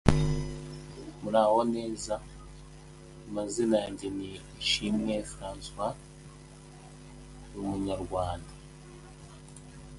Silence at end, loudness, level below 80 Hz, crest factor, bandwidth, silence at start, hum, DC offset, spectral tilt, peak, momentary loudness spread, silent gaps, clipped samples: 0 s; -31 LUFS; -46 dBFS; 30 dB; 11.5 kHz; 0.05 s; none; under 0.1%; -5.5 dB/octave; -2 dBFS; 23 LU; none; under 0.1%